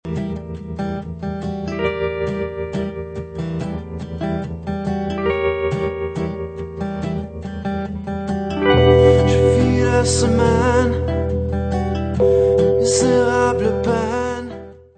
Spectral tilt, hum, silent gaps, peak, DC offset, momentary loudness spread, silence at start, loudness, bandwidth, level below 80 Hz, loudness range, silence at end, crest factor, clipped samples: -6 dB/octave; none; none; 0 dBFS; under 0.1%; 13 LU; 0.05 s; -19 LUFS; 9.2 kHz; -32 dBFS; 9 LU; 0.2 s; 18 dB; under 0.1%